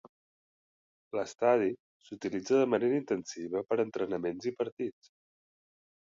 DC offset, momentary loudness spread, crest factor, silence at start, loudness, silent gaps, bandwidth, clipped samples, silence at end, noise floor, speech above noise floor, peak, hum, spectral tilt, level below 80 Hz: under 0.1%; 12 LU; 18 dB; 1.15 s; -32 LUFS; 1.80-2.00 s, 4.72-4.77 s; 7.6 kHz; under 0.1%; 1.2 s; under -90 dBFS; over 59 dB; -14 dBFS; none; -5.5 dB/octave; -74 dBFS